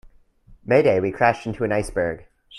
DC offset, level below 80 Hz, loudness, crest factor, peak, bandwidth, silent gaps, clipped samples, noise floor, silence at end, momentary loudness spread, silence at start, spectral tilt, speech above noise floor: under 0.1%; -46 dBFS; -21 LUFS; 18 dB; -4 dBFS; 12 kHz; none; under 0.1%; -51 dBFS; 0 s; 12 LU; 0.5 s; -6.5 dB/octave; 31 dB